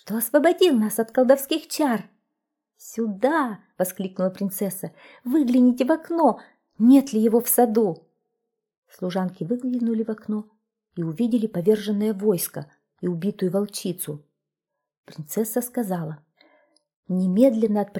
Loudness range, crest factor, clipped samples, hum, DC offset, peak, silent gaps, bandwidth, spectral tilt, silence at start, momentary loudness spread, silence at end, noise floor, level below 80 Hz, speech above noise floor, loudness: 9 LU; 18 dB; under 0.1%; none; under 0.1%; -4 dBFS; 8.77-8.82 s, 14.98-15.03 s, 16.96-17.03 s; 20 kHz; -5.5 dB/octave; 0.05 s; 13 LU; 0 s; -84 dBFS; -72 dBFS; 62 dB; -22 LUFS